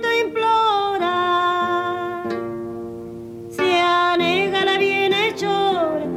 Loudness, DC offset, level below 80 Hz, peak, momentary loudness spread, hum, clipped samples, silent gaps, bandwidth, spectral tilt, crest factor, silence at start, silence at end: -19 LUFS; under 0.1%; -58 dBFS; -8 dBFS; 14 LU; none; under 0.1%; none; 15 kHz; -4.5 dB/octave; 12 dB; 0 s; 0 s